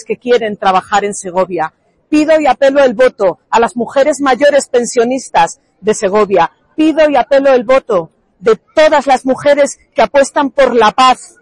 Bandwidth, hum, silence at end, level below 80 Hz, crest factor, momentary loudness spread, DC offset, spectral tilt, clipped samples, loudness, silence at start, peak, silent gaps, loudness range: 11.5 kHz; none; 0.15 s; -46 dBFS; 10 dB; 7 LU; under 0.1%; -3.5 dB/octave; under 0.1%; -11 LUFS; 0.1 s; 0 dBFS; none; 1 LU